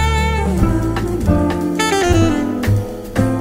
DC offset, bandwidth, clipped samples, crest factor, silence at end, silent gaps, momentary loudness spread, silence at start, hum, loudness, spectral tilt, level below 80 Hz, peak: under 0.1%; 16 kHz; under 0.1%; 14 dB; 0 s; none; 5 LU; 0 s; none; -17 LUFS; -6 dB/octave; -24 dBFS; 0 dBFS